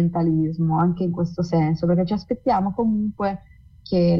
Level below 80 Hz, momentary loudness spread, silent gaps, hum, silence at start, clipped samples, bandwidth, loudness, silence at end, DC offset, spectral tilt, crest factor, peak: -48 dBFS; 5 LU; none; none; 0 s; under 0.1%; 6.2 kHz; -22 LUFS; 0 s; under 0.1%; -9.5 dB/octave; 12 dB; -10 dBFS